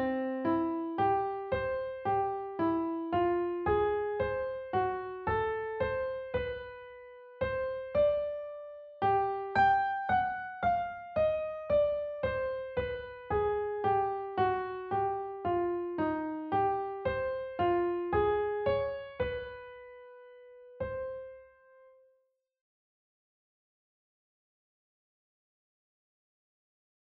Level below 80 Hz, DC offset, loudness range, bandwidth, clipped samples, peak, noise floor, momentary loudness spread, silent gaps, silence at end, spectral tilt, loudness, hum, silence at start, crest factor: -54 dBFS; under 0.1%; 11 LU; 5.2 kHz; under 0.1%; -16 dBFS; -75 dBFS; 11 LU; none; 5.65 s; -5 dB/octave; -32 LUFS; none; 0 s; 18 dB